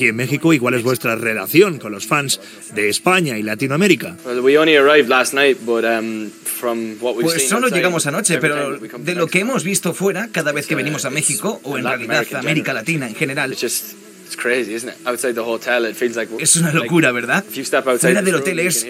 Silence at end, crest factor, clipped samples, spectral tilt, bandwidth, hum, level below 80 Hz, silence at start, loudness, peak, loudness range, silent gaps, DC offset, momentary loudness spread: 0 s; 18 dB; under 0.1%; -3.5 dB/octave; 16.5 kHz; none; -70 dBFS; 0 s; -17 LUFS; 0 dBFS; 5 LU; none; under 0.1%; 9 LU